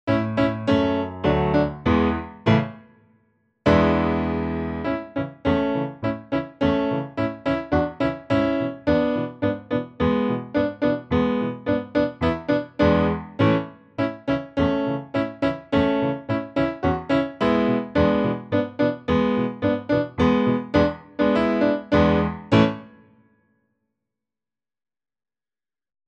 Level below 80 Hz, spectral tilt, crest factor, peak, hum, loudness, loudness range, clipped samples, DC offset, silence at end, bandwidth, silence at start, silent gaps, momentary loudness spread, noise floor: -42 dBFS; -8 dB/octave; 18 dB; -4 dBFS; none; -22 LUFS; 3 LU; under 0.1%; under 0.1%; 3.2 s; 8 kHz; 0.05 s; none; 7 LU; under -90 dBFS